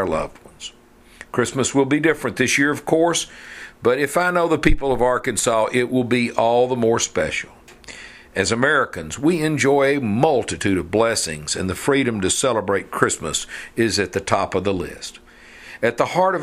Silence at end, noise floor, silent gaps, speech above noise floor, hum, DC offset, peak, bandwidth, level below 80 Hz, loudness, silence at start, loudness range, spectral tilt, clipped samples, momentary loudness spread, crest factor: 0 s; -49 dBFS; none; 30 dB; none; under 0.1%; 0 dBFS; 15.5 kHz; -36 dBFS; -20 LUFS; 0 s; 2 LU; -4 dB/octave; under 0.1%; 14 LU; 20 dB